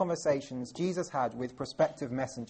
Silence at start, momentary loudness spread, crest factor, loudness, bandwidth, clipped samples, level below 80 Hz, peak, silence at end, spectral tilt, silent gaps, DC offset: 0 s; 7 LU; 18 dB; -33 LUFS; 8.4 kHz; under 0.1%; -66 dBFS; -14 dBFS; 0.05 s; -5.5 dB/octave; none; under 0.1%